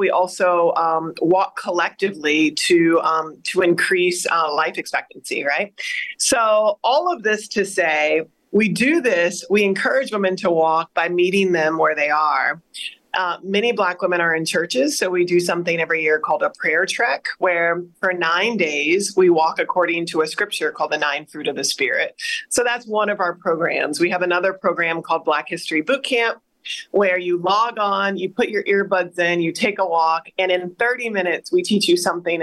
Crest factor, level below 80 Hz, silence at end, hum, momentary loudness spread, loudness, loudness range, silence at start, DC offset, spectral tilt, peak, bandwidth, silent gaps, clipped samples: 12 dB; -68 dBFS; 0 s; none; 6 LU; -19 LUFS; 2 LU; 0 s; under 0.1%; -3.5 dB/octave; -6 dBFS; 12.5 kHz; none; under 0.1%